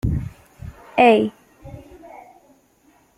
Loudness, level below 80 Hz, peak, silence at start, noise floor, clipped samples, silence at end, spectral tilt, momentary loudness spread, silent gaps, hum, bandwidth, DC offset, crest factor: -18 LUFS; -38 dBFS; -2 dBFS; 0.05 s; -57 dBFS; under 0.1%; 1.4 s; -7.5 dB/octave; 27 LU; none; none; 14.5 kHz; under 0.1%; 20 dB